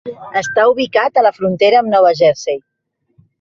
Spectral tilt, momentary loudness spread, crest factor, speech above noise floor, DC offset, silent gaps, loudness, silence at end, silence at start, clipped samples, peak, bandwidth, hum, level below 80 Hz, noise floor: -4.5 dB/octave; 10 LU; 12 dB; 50 dB; under 0.1%; none; -13 LUFS; 0.85 s; 0.05 s; under 0.1%; -2 dBFS; 7.8 kHz; none; -58 dBFS; -62 dBFS